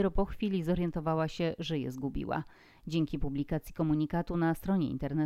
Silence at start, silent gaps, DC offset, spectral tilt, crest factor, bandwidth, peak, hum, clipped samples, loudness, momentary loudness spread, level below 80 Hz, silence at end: 0 s; none; under 0.1%; -7.5 dB/octave; 16 dB; 15 kHz; -16 dBFS; none; under 0.1%; -33 LUFS; 6 LU; -44 dBFS; 0 s